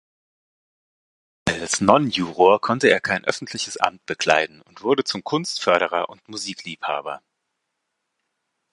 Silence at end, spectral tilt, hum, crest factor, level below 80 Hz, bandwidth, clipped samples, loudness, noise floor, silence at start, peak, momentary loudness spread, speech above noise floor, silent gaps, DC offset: 1.55 s; -3.5 dB/octave; none; 22 dB; -56 dBFS; 11.5 kHz; under 0.1%; -21 LUFS; -78 dBFS; 1.45 s; 0 dBFS; 13 LU; 56 dB; none; under 0.1%